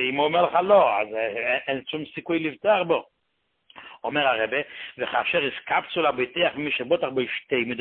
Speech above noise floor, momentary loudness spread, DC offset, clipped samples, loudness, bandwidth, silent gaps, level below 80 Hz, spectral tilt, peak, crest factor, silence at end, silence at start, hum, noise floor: 50 dB; 9 LU; under 0.1%; under 0.1%; -24 LUFS; 4.4 kHz; none; -66 dBFS; -9 dB/octave; -6 dBFS; 18 dB; 0 s; 0 s; none; -74 dBFS